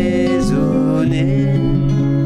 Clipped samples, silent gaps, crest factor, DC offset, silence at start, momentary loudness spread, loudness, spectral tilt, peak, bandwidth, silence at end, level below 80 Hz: under 0.1%; none; 8 dB; under 0.1%; 0 s; 0 LU; -16 LUFS; -8 dB/octave; -6 dBFS; 10.5 kHz; 0 s; -30 dBFS